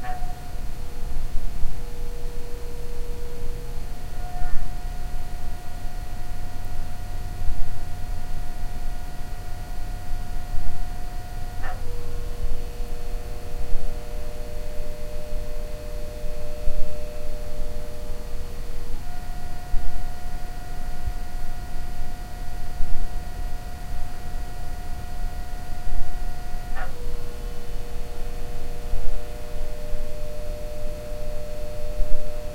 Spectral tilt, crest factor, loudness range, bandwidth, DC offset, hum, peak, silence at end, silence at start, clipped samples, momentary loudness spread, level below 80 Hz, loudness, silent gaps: -5.5 dB/octave; 16 dB; 1 LU; 7.8 kHz; under 0.1%; none; -2 dBFS; 0 s; 0 s; under 0.1%; 4 LU; -26 dBFS; -36 LUFS; none